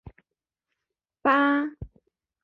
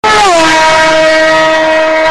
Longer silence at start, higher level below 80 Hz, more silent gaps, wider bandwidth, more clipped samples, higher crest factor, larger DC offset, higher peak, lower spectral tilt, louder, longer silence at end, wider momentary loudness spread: about the same, 0.05 s vs 0.05 s; second, -54 dBFS vs -36 dBFS; neither; second, 5.4 kHz vs 14.5 kHz; neither; first, 18 dB vs 6 dB; neither; second, -10 dBFS vs 0 dBFS; first, -7.5 dB/octave vs -2 dB/octave; second, -24 LUFS vs -6 LUFS; first, 0.6 s vs 0 s; first, 24 LU vs 2 LU